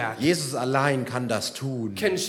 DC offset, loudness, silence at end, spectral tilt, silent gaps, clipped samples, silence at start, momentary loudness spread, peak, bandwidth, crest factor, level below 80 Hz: under 0.1%; -25 LUFS; 0 s; -4.5 dB/octave; none; under 0.1%; 0 s; 6 LU; -6 dBFS; 19 kHz; 18 dB; -68 dBFS